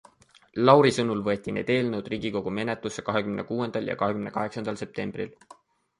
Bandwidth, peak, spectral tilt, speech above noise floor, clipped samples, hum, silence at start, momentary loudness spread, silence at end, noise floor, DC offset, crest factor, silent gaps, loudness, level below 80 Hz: 11.5 kHz; -2 dBFS; -6 dB/octave; 33 dB; under 0.1%; none; 0.55 s; 14 LU; 0.7 s; -58 dBFS; under 0.1%; 24 dB; none; -26 LUFS; -60 dBFS